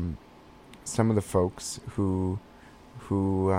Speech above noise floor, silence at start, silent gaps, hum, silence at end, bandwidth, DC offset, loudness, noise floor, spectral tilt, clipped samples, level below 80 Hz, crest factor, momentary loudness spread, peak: 25 dB; 0 s; none; none; 0 s; 16 kHz; under 0.1%; -29 LUFS; -52 dBFS; -6.5 dB/octave; under 0.1%; -52 dBFS; 20 dB; 17 LU; -8 dBFS